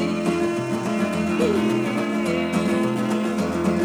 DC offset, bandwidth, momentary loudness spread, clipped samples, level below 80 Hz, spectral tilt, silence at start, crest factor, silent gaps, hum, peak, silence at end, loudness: under 0.1%; over 20 kHz; 3 LU; under 0.1%; -54 dBFS; -6 dB/octave; 0 s; 12 dB; none; none; -10 dBFS; 0 s; -22 LUFS